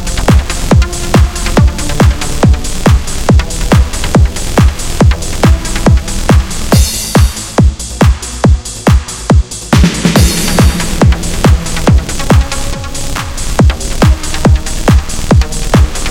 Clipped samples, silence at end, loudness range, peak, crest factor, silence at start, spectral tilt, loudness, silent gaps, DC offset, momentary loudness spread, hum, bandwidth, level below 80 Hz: 1%; 0 s; 2 LU; 0 dBFS; 8 dB; 0 s; -5 dB/octave; -11 LUFS; none; under 0.1%; 3 LU; none; 16.5 kHz; -12 dBFS